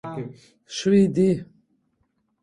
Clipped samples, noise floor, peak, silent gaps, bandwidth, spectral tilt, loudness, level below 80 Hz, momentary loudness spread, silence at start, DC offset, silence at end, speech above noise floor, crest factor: under 0.1%; -70 dBFS; -8 dBFS; none; 10.5 kHz; -6.5 dB/octave; -21 LUFS; -58 dBFS; 17 LU; 0.05 s; under 0.1%; 1 s; 49 dB; 16 dB